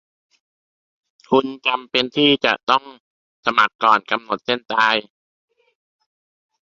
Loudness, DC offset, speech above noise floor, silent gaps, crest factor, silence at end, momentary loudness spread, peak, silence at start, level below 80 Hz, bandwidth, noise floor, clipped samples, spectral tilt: -18 LUFS; under 0.1%; over 71 dB; 2.63-2.67 s, 3.00-3.43 s, 3.75-3.79 s; 22 dB; 1.75 s; 7 LU; 0 dBFS; 1.3 s; -66 dBFS; 7.8 kHz; under -90 dBFS; under 0.1%; -4.5 dB/octave